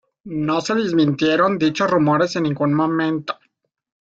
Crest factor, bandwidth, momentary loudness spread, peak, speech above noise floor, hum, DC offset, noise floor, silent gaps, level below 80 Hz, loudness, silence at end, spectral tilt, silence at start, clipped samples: 16 dB; 7.8 kHz; 9 LU; -4 dBFS; 48 dB; none; under 0.1%; -67 dBFS; none; -60 dBFS; -19 LUFS; 0.85 s; -6 dB/octave; 0.25 s; under 0.1%